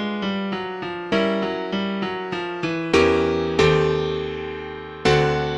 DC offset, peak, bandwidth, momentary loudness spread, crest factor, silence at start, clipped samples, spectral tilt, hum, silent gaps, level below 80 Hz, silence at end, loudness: under 0.1%; -4 dBFS; 10.5 kHz; 11 LU; 18 dB; 0 s; under 0.1%; -6 dB/octave; none; none; -42 dBFS; 0 s; -22 LUFS